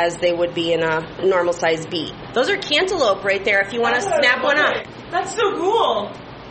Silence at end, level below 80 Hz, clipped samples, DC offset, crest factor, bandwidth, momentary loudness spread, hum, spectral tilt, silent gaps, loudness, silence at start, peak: 0 s; -52 dBFS; under 0.1%; under 0.1%; 16 dB; 8.8 kHz; 9 LU; none; -3.5 dB/octave; none; -19 LUFS; 0 s; -2 dBFS